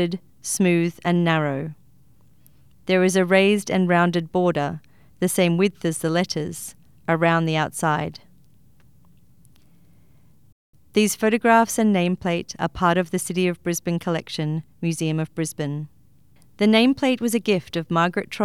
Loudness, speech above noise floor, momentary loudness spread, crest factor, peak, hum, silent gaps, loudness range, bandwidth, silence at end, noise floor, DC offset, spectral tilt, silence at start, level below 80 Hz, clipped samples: -21 LUFS; 36 dB; 11 LU; 18 dB; -4 dBFS; none; 10.52-10.73 s; 6 LU; 15.5 kHz; 0 s; -57 dBFS; 0.2%; -5 dB/octave; 0 s; -58 dBFS; under 0.1%